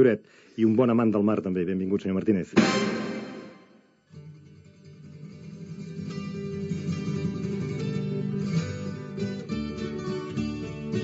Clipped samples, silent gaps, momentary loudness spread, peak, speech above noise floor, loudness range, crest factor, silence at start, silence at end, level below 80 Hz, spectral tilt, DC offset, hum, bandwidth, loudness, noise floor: under 0.1%; none; 21 LU; -6 dBFS; 34 dB; 14 LU; 22 dB; 0 s; 0 s; -56 dBFS; -6.5 dB/octave; under 0.1%; none; 8 kHz; -28 LUFS; -58 dBFS